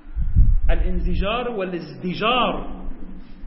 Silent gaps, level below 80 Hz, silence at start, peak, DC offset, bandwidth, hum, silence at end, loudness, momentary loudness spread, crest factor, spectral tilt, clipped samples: none; -22 dBFS; 0.05 s; -4 dBFS; under 0.1%; 5.8 kHz; none; 0 s; -23 LUFS; 18 LU; 16 dB; -10 dB/octave; under 0.1%